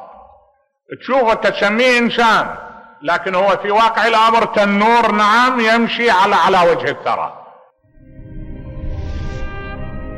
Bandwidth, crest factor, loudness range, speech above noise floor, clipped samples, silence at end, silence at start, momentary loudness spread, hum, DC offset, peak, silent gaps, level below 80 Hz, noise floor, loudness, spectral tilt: 14 kHz; 10 dB; 7 LU; 43 dB; under 0.1%; 0 s; 0 s; 17 LU; none; under 0.1%; -6 dBFS; none; -34 dBFS; -57 dBFS; -13 LUFS; -4.5 dB/octave